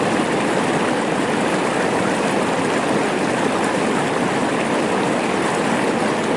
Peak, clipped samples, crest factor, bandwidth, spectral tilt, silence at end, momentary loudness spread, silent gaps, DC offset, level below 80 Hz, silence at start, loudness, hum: -4 dBFS; under 0.1%; 14 dB; 11.5 kHz; -4.5 dB/octave; 0 s; 1 LU; none; 0.1%; -56 dBFS; 0 s; -19 LUFS; none